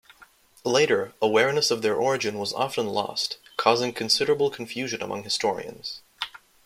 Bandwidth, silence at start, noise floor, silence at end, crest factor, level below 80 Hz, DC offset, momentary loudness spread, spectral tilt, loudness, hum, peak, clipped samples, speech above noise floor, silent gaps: 16 kHz; 0.65 s; -55 dBFS; 0.3 s; 22 dB; -68 dBFS; under 0.1%; 13 LU; -3 dB/octave; -25 LUFS; none; -4 dBFS; under 0.1%; 30 dB; none